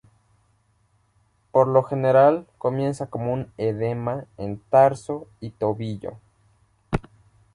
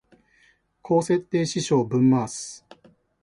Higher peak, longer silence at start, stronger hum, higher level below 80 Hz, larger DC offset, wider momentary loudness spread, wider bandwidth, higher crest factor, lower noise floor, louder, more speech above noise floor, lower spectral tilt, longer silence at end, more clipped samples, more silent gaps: first, -4 dBFS vs -8 dBFS; first, 1.55 s vs 0.85 s; neither; first, -50 dBFS vs -62 dBFS; neither; about the same, 16 LU vs 15 LU; about the same, 11 kHz vs 11.5 kHz; about the same, 20 dB vs 16 dB; about the same, -64 dBFS vs -62 dBFS; about the same, -23 LUFS vs -23 LUFS; about the same, 43 dB vs 40 dB; first, -8 dB/octave vs -6 dB/octave; about the same, 0.55 s vs 0.65 s; neither; neither